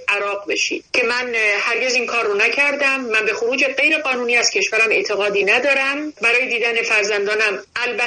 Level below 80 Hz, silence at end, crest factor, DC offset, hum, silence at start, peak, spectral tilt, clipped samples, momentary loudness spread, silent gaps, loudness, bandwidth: -64 dBFS; 0 s; 16 dB; under 0.1%; none; 0 s; -4 dBFS; -1 dB/octave; under 0.1%; 5 LU; none; -16 LUFS; 9.4 kHz